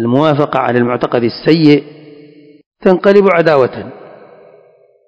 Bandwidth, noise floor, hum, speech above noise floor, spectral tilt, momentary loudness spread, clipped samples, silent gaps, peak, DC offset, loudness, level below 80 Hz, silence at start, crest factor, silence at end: 8 kHz; -47 dBFS; none; 37 dB; -8 dB/octave; 7 LU; 0.9%; 2.66-2.71 s; 0 dBFS; under 0.1%; -11 LUFS; -54 dBFS; 0 s; 12 dB; 1.15 s